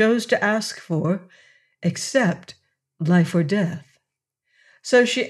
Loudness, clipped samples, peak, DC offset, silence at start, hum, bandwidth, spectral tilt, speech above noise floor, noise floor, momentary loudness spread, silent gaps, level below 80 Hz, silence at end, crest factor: -21 LUFS; under 0.1%; -4 dBFS; under 0.1%; 0 s; none; 12.5 kHz; -5.5 dB/octave; 60 dB; -80 dBFS; 10 LU; none; -72 dBFS; 0 s; 18 dB